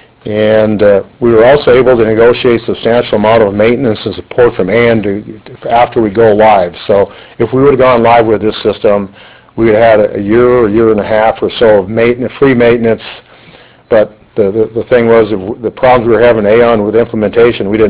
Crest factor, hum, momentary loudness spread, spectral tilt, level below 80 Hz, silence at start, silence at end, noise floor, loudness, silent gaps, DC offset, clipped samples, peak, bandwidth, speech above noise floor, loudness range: 8 dB; none; 8 LU; -10.5 dB/octave; -36 dBFS; 0.25 s; 0 s; -38 dBFS; -8 LUFS; none; under 0.1%; 1%; 0 dBFS; 4 kHz; 30 dB; 3 LU